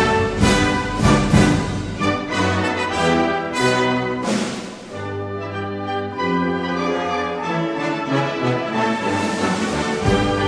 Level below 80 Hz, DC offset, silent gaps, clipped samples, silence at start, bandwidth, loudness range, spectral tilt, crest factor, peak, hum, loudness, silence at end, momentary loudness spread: -36 dBFS; under 0.1%; none; under 0.1%; 0 s; 11 kHz; 5 LU; -5.5 dB/octave; 18 dB; -2 dBFS; none; -20 LUFS; 0 s; 10 LU